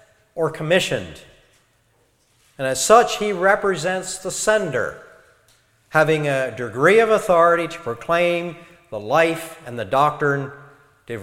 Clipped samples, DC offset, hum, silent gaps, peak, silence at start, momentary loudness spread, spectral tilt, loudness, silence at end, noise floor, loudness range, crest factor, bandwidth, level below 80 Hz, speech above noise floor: under 0.1%; under 0.1%; none; none; 0 dBFS; 0.35 s; 16 LU; -4 dB/octave; -19 LUFS; 0 s; -62 dBFS; 3 LU; 20 dB; 16.5 kHz; -54 dBFS; 43 dB